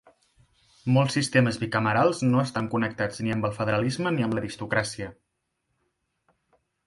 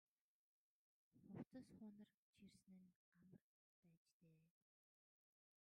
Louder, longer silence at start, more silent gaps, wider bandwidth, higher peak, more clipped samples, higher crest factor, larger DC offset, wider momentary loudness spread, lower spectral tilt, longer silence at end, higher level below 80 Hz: first, -25 LUFS vs -62 LUFS; second, 0.85 s vs 1.15 s; second, none vs 1.47-1.51 s, 2.14-2.33 s, 2.96-3.12 s, 3.41-3.83 s, 3.97-4.06 s, 4.12-4.20 s; first, 11.5 kHz vs 9.4 kHz; first, -6 dBFS vs -44 dBFS; neither; about the same, 20 dB vs 24 dB; neither; about the same, 8 LU vs 9 LU; about the same, -6 dB/octave vs -7 dB/octave; first, 1.75 s vs 1.15 s; first, -58 dBFS vs under -90 dBFS